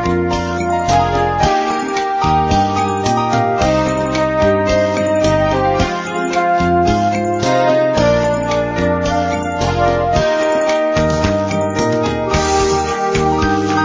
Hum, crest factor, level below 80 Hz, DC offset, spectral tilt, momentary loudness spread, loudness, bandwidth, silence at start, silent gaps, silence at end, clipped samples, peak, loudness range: none; 14 dB; -30 dBFS; under 0.1%; -5.5 dB/octave; 4 LU; -15 LUFS; 7.8 kHz; 0 s; none; 0 s; under 0.1%; -2 dBFS; 1 LU